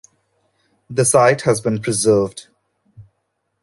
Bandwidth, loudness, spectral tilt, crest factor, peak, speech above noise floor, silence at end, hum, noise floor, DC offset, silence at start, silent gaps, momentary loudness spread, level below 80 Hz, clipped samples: 12 kHz; -16 LUFS; -4.5 dB/octave; 18 dB; -2 dBFS; 56 dB; 0.6 s; none; -72 dBFS; under 0.1%; 0.9 s; none; 13 LU; -56 dBFS; under 0.1%